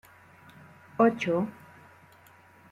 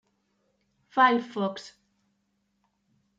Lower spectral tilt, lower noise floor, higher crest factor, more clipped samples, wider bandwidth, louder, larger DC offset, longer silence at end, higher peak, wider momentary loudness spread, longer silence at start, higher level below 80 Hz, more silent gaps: first, -7 dB/octave vs -5 dB/octave; second, -56 dBFS vs -75 dBFS; about the same, 22 dB vs 24 dB; neither; first, 14 kHz vs 7.8 kHz; about the same, -27 LUFS vs -25 LUFS; neither; second, 1.2 s vs 1.5 s; about the same, -10 dBFS vs -8 dBFS; first, 20 LU vs 12 LU; about the same, 1 s vs 0.95 s; first, -74 dBFS vs -80 dBFS; neither